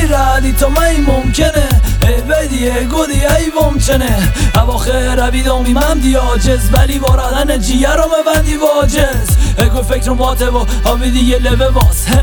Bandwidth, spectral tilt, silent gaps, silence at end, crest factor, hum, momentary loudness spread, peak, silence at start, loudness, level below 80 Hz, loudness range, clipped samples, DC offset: 19.5 kHz; -5 dB/octave; none; 0 s; 10 dB; none; 3 LU; 0 dBFS; 0 s; -12 LUFS; -14 dBFS; 1 LU; under 0.1%; under 0.1%